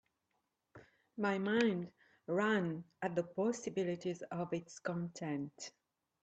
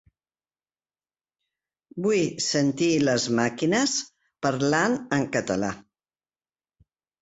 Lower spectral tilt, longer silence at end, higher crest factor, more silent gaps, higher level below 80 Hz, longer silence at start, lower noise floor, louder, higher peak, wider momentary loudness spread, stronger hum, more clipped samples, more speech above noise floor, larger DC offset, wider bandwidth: first, -5.5 dB/octave vs -4 dB/octave; second, 0.55 s vs 1.4 s; about the same, 18 dB vs 18 dB; neither; second, -80 dBFS vs -62 dBFS; second, 0.75 s vs 1.95 s; second, -84 dBFS vs under -90 dBFS; second, -38 LUFS vs -24 LUFS; second, -20 dBFS vs -8 dBFS; first, 14 LU vs 7 LU; neither; neither; second, 47 dB vs over 66 dB; neither; about the same, 8.8 kHz vs 8.2 kHz